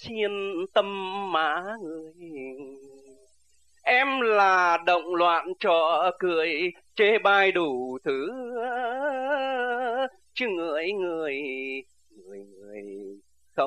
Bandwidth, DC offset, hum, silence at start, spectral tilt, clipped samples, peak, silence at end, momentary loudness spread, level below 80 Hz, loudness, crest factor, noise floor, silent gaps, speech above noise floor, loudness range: 10.5 kHz; under 0.1%; none; 0 s; -4.5 dB/octave; under 0.1%; -8 dBFS; 0 s; 20 LU; -74 dBFS; -25 LUFS; 18 dB; -67 dBFS; none; 41 dB; 8 LU